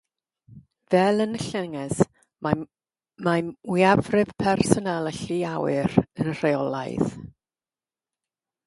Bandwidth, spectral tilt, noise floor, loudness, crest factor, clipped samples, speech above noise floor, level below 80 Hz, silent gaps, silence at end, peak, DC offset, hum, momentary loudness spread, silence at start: 11.5 kHz; -6 dB/octave; under -90 dBFS; -24 LUFS; 24 dB; under 0.1%; over 67 dB; -54 dBFS; none; 1.4 s; 0 dBFS; under 0.1%; none; 9 LU; 0.5 s